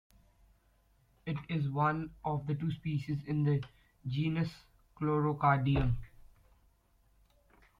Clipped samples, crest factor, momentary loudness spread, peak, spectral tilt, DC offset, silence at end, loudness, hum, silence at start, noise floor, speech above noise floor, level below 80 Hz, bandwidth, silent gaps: under 0.1%; 22 dB; 11 LU; -14 dBFS; -9 dB/octave; under 0.1%; 1.75 s; -34 LUFS; none; 1.25 s; -69 dBFS; 37 dB; -50 dBFS; 5.6 kHz; none